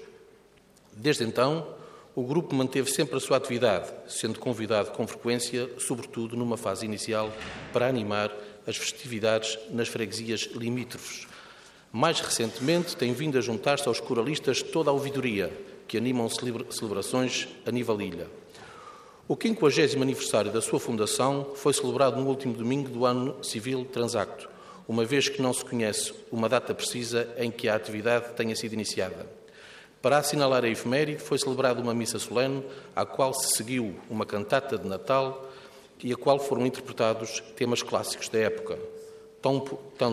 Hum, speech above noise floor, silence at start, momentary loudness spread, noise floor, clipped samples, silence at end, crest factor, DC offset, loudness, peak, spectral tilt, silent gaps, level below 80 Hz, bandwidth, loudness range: none; 30 dB; 0 s; 12 LU; -58 dBFS; under 0.1%; 0 s; 20 dB; under 0.1%; -28 LUFS; -8 dBFS; -4 dB/octave; none; -68 dBFS; 15 kHz; 4 LU